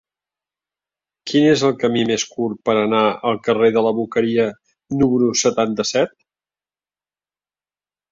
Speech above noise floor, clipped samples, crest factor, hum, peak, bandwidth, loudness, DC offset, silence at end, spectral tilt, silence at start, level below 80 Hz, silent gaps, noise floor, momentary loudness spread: over 73 dB; under 0.1%; 16 dB; none; -4 dBFS; 7.6 kHz; -18 LUFS; under 0.1%; 2.05 s; -4.5 dB/octave; 1.25 s; -56 dBFS; none; under -90 dBFS; 7 LU